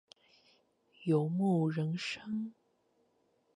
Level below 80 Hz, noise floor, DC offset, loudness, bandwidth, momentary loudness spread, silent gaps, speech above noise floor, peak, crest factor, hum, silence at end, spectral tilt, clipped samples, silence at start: -82 dBFS; -74 dBFS; under 0.1%; -34 LUFS; 10.5 kHz; 10 LU; none; 42 dB; -18 dBFS; 18 dB; none; 1.05 s; -7.5 dB/octave; under 0.1%; 1 s